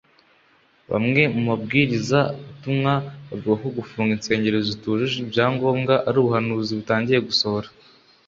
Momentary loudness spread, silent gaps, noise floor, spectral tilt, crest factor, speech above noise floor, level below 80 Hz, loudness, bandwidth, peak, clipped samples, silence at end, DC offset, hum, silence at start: 7 LU; none; -58 dBFS; -6 dB/octave; 20 dB; 37 dB; -56 dBFS; -21 LUFS; 7.8 kHz; -2 dBFS; under 0.1%; 0.6 s; under 0.1%; none; 0.9 s